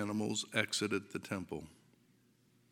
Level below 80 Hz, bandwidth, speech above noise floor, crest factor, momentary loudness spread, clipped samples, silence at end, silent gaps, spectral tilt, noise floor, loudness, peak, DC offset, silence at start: -74 dBFS; 16.5 kHz; 32 dB; 26 dB; 12 LU; under 0.1%; 1 s; none; -3.5 dB/octave; -70 dBFS; -37 LUFS; -14 dBFS; under 0.1%; 0 s